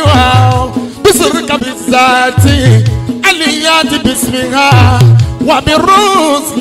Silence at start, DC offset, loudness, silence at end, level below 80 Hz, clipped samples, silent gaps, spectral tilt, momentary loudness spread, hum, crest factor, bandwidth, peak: 0 s; under 0.1%; -8 LUFS; 0 s; -26 dBFS; 0.2%; none; -5 dB/octave; 6 LU; none; 8 dB; 16 kHz; 0 dBFS